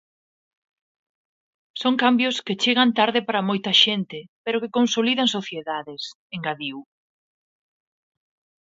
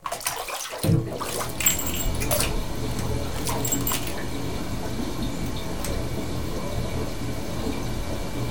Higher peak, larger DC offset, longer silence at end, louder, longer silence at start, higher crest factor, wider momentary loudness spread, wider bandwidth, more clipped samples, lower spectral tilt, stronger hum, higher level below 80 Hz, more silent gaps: about the same, -2 dBFS vs -4 dBFS; second, under 0.1% vs 3%; first, 1.8 s vs 0 s; first, -21 LUFS vs -27 LUFS; first, 1.75 s vs 0 s; about the same, 22 dB vs 22 dB; first, 15 LU vs 7 LU; second, 7.8 kHz vs over 20 kHz; neither; about the same, -3.5 dB/octave vs -4 dB/octave; neither; second, -74 dBFS vs -36 dBFS; first, 4.29-4.44 s, 6.15-6.30 s vs none